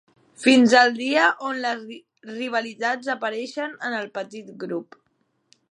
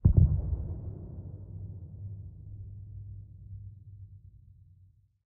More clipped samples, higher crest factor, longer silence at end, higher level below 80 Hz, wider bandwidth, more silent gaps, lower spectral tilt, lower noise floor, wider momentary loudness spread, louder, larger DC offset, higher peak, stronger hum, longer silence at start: neither; about the same, 22 dB vs 24 dB; about the same, 0.9 s vs 0.9 s; second, -80 dBFS vs -38 dBFS; first, 10.5 kHz vs 1.4 kHz; neither; second, -3.5 dB/octave vs -16.5 dB/octave; first, -70 dBFS vs -62 dBFS; second, 19 LU vs 23 LU; first, -22 LUFS vs -34 LUFS; neither; first, -2 dBFS vs -8 dBFS; neither; first, 0.4 s vs 0.05 s